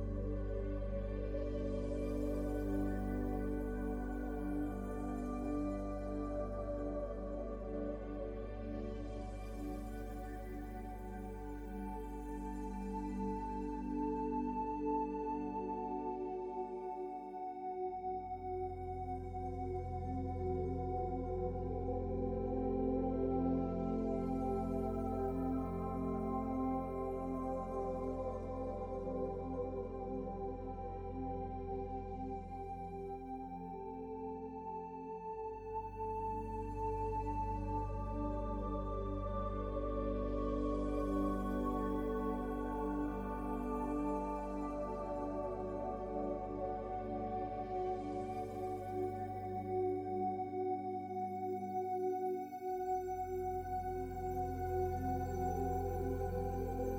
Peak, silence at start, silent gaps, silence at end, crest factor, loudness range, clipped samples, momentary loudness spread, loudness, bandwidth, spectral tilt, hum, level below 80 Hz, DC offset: -24 dBFS; 0 s; none; 0 s; 16 dB; 6 LU; under 0.1%; 7 LU; -41 LUFS; 17 kHz; -9 dB/octave; none; -48 dBFS; under 0.1%